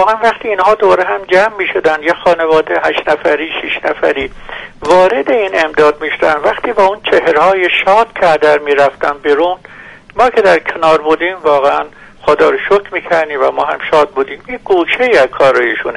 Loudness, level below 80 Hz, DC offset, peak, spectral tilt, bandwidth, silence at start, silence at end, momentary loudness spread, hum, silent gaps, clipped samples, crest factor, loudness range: -11 LUFS; -44 dBFS; under 0.1%; 0 dBFS; -4.5 dB/octave; 11.5 kHz; 0 s; 0 s; 7 LU; none; none; under 0.1%; 12 dB; 2 LU